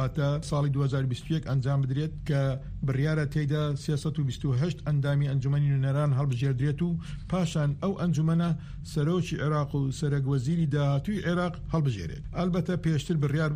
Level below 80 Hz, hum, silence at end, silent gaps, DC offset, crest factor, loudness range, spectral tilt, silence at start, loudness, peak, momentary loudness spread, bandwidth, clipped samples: -46 dBFS; none; 0 s; none; under 0.1%; 12 dB; 1 LU; -7.5 dB/octave; 0 s; -28 LUFS; -16 dBFS; 4 LU; 10.5 kHz; under 0.1%